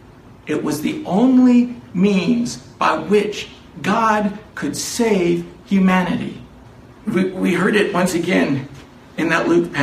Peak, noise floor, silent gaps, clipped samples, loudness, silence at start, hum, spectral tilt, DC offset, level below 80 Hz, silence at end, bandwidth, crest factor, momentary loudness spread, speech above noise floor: -2 dBFS; -42 dBFS; none; under 0.1%; -18 LUFS; 0.3 s; none; -5.5 dB/octave; under 0.1%; -50 dBFS; 0 s; 15 kHz; 16 dB; 11 LU; 25 dB